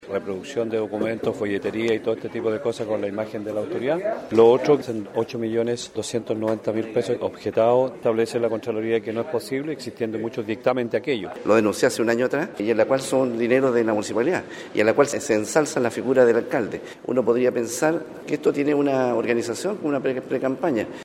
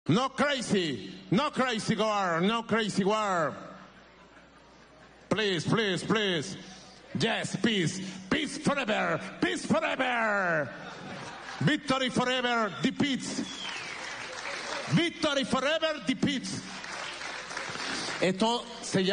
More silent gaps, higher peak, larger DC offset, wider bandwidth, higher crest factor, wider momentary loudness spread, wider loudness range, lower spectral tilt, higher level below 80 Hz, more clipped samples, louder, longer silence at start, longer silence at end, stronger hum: neither; first, -2 dBFS vs -14 dBFS; neither; first, 15.5 kHz vs 10 kHz; about the same, 20 dB vs 16 dB; about the same, 9 LU vs 11 LU; about the same, 4 LU vs 3 LU; about the same, -5 dB/octave vs -4.5 dB/octave; about the same, -64 dBFS vs -64 dBFS; neither; first, -23 LUFS vs -29 LUFS; about the same, 0 s vs 0.05 s; about the same, 0 s vs 0 s; neither